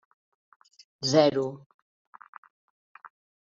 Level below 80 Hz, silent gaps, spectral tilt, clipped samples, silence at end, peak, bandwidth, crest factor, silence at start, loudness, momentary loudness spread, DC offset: -74 dBFS; none; -4.5 dB/octave; under 0.1%; 1.9 s; -8 dBFS; 7.6 kHz; 24 dB; 1 s; -25 LUFS; 28 LU; under 0.1%